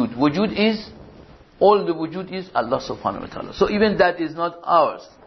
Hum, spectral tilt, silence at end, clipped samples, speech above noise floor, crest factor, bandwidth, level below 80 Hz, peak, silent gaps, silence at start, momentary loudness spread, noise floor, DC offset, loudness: none; -6.5 dB/octave; 0.2 s; under 0.1%; 26 dB; 18 dB; 6.2 kHz; -50 dBFS; -4 dBFS; none; 0 s; 12 LU; -46 dBFS; under 0.1%; -20 LUFS